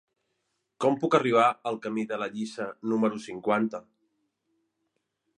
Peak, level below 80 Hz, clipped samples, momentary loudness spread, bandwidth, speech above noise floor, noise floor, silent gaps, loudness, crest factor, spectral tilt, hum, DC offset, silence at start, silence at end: -8 dBFS; -78 dBFS; under 0.1%; 11 LU; 10.5 kHz; 52 dB; -79 dBFS; none; -27 LUFS; 22 dB; -6 dB/octave; none; under 0.1%; 0.8 s; 1.6 s